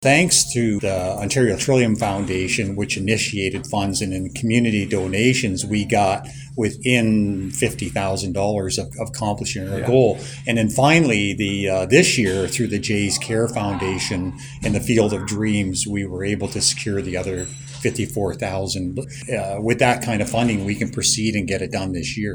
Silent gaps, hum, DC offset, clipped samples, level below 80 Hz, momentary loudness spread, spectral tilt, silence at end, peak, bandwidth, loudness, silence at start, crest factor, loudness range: none; none; under 0.1%; under 0.1%; -44 dBFS; 9 LU; -4.5 dB/octave; 0 s; 0 dBFS; over 20 kHz; -20 LUFS; 0 s; 20 dB; 5 LU